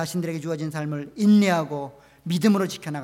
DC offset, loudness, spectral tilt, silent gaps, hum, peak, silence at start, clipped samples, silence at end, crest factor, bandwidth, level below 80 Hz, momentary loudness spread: under 0.1%; -23 LUFS; -6 dB/octave; none; none; -10 dBFS; 0 s; under 0.1%; 0 s; 14 dB; 15.5 kHz; -66 dBFS; 14 LU